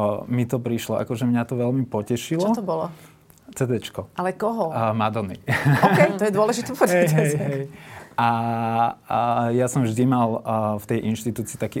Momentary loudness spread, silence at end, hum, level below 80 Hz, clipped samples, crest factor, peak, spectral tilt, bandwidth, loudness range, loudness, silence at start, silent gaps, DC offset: 10 LU; 0 s; none; -60 dBFS; under 0.1%; 18 dB; -4 dBFS; -6.5 dB/octave; 17 kHz; 5 LU; -22 LUFS; 0 s; none; under 0.1%